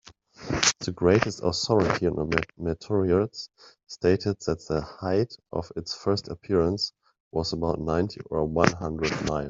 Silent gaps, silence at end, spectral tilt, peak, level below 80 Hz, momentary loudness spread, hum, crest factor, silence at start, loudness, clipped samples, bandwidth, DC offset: 7.20-7.31 s; 0 s; -4.5 dB/octave; -2 dBFS; -48 dBFS; 10 LU; none; 24 dB; 0.4 s; -26 LUFS; under 0.1%; 7.8 kHz; under 0.1%